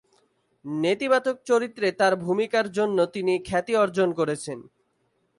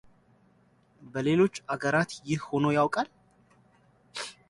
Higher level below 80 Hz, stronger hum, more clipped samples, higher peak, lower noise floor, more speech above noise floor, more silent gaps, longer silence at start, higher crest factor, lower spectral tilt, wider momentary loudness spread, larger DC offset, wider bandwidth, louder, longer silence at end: first, -62 dBFS vs -68 dBFS; neither; neither; first, -8 dBFS vs -12 dBFS; first, -71 dBFS vs -64 dBFS; first, 47 dB vs 37 dB; neither; second, 0.65 s vs 1 s; about the same, 16 dB vs 18 dB; about the same, -5 dB/octave vs -6 dB/octave; second, 9 LU vs 14 LU; neither; about the same, 11.5 kHz vs 11.5 kHz; first, -24 LUFS vs -28 LUFS; first, 0.75 s vs 0.15 s